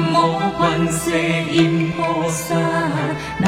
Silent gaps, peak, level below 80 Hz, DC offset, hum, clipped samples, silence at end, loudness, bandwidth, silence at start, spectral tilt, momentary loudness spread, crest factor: none; -2 dBFS; -44 dBFS; under 0.1%; none; under 0.1%; 0 s; -18 LUFS; 16 kHz; 0 s; -5 dB/octave; 4 LU; 16 dB